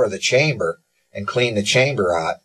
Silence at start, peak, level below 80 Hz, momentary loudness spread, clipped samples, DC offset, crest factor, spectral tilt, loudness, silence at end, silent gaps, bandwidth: 0 s; -2 dBFS; -52 dBFS; 14 LU; under 0.1%; under 0.1%; 16 dB; -4 dB/octave; -18 LUFS; 0.1 s; none; 12.5 kHz